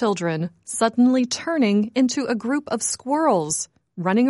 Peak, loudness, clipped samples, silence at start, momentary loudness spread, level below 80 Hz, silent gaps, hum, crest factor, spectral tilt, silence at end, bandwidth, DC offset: -6 dBFS; -22 LUFS; under 0.1%; 0 s; 8 LU; -66 dBFS; none; none; 14 dB; -4.5 dB/octave; 0 s; 11.5 kHz; under 0.1%